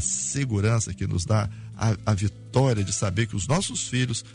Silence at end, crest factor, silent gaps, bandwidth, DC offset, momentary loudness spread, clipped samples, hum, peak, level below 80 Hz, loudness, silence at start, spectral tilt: 0 s; 16 dB; none; 11 kHz; under 0.1%; 4 LU; under 0.1%; none; -8 dBFS; -48 dBFS; -25 LUFS; 0 s; -4.5 dB/octave